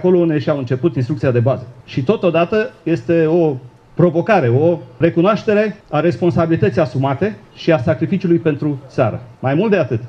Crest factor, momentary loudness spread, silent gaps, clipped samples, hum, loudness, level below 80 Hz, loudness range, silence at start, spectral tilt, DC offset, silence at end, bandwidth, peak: 14 dB; 7 LU; none; under 0.1%; none; -16 LUFS; -50 dBFS; 2 LU; 0 s; -9 dB/octave; under 0.1%; 0 s; 7.2 kHz; 0 dBFS